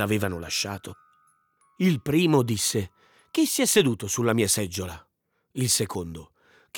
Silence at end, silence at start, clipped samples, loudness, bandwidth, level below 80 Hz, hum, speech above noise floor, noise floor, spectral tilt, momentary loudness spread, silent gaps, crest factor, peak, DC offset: 0 s; 0 s; under 0.1%; -24 LUFS; over 20 kHz; -60 dBFS; none; 41 dB; -66 dBFS; -4 dB/octave; 18 LU; none; 18 dB; -8 dBFS; under 0.1%